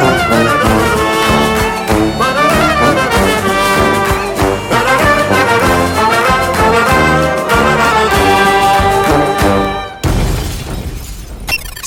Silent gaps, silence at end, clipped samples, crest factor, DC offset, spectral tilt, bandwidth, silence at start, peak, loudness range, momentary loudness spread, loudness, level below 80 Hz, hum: none; 0 s; under 0.1%; 12 dB; under 0.1%; -4.5 dB/octave; 17.5 kHz; 0 s; 0 dBFS; 2 LU; 8 LU; -11 LUFS; -24 dBFS; none